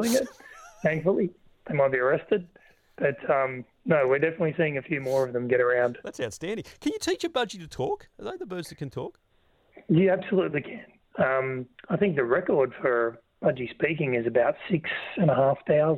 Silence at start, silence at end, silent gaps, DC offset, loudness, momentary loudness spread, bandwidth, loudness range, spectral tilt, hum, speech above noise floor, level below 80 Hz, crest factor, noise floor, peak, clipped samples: 0 s; 0 s; none; under 0.1%; -27 LUFS; 13 LU; 16.5 kHz; 5 LU; -6 dB/octave; none; 38 dB; -62 dBFS; 18 dB; -64 dBFS; -10 dBFS; under 0.1%